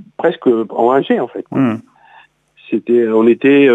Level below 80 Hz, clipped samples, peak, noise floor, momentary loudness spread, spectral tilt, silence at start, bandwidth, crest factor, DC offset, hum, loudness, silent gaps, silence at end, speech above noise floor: -68 dBFS; under 0.1%; 0 dBFS; -47 dBFS; 10 LU; -8.5 dB/octave; 0.2 s; 4 kHz; 12 dB; under 0.1%; none; -14 LUFS; none; 0 s; 34 dB